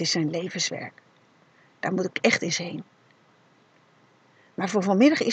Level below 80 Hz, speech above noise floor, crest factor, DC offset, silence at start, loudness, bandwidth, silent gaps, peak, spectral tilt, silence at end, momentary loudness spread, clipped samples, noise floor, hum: -80 dBFS; 36 dB; 22 dB; under 0.1%; 0 s; -25 LUFS; 8.8 kHz; none; -6 dBFS; -4 dB/octave; 0 s; 18 LU; under 0.1%; -60 dBFS; none